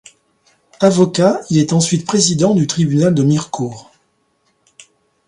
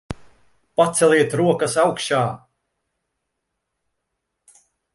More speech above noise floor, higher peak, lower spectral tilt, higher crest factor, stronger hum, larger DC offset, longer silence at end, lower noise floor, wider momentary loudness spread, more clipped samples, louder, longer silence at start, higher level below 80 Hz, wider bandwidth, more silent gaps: second, 49 dB vs 60 dB; first, 0 dBFS vs -4 dBFS; about the same, -5.5 dB/octave vs -4.5 dB/octave; about the same, 16 dB vs 20 dB; neither; neither; second, 1.45 s vs 2.55 s; second, -62 dBFS vs -78 dBFS; second, 5 LU vs 20 LU; neither; first, -14 LUFS vs -19 LUFS; first, 0.8 s vs 0.1 s; about the same, -54 dBFS vs -54 dBFS; about the same, 11.5 kHz vs 11.5 kHz; neither